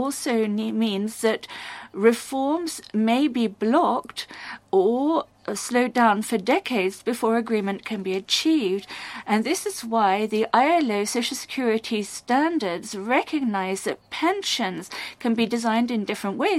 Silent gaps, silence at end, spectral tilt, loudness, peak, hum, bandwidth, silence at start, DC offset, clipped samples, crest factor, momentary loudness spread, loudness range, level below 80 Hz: none; 0 s; -4 dB/octave; -23 LUFS; -4 dBFS; none; 15.5 kHz; 0 s; under 0.1%; under 0.1%; 18 dB; 9 LU; 2 LU; -68 dBFS